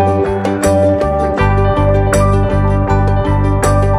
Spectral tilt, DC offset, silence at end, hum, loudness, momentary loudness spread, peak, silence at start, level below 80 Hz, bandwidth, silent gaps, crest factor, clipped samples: -7 dB/octave; under 0.1%; 0 s; none; -13 LUFS; 2 LU; 0 dBFS; 0 s; -20 dBFS; 14 kHz; none; 12 dB; under 0.1%